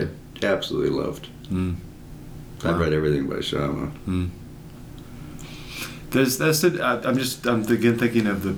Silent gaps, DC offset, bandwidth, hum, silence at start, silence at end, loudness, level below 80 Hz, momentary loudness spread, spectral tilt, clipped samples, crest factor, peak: none; under 0.1%; over 20 kHz; none; 0 s; 0 s; -23 LUFS; -44 dBFS; 21 LU; -5 dB/octave; under 0.1%; 18 dB; -6 dBFS